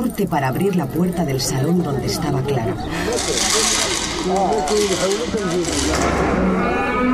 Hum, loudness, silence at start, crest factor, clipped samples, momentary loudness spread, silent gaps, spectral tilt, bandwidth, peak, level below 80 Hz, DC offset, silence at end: none; -19 LUFS; 0 s; 14 dB; under 0.1%; 5 LU; none; -4 dB/octave; 16 kHz; -4 dBFS; -34 dBFS; under 0.1%; 0 s